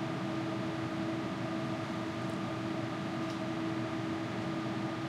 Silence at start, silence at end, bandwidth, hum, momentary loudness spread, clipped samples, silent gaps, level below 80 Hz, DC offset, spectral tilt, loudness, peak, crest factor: 0 s; 0 s; 12.5 kHz; none; 1 LU; under 0.1%; none; -68 dBFS; under 0.1%; -6.5 dB/octave; -36 LUFS; -24 dBFS; 12 dB